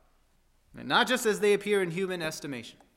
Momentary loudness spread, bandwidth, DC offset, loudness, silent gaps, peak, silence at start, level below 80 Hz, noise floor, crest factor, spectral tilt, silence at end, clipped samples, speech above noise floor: 14 LU; 16 kHz; under 0.1%; -27 LUFS; none; -10 dBFS; 0.75 s; -66 dBFS; -66 dBFS; 20 dB; -3.5 dB/octave; 0.25 s; under 0.1%; 38 dB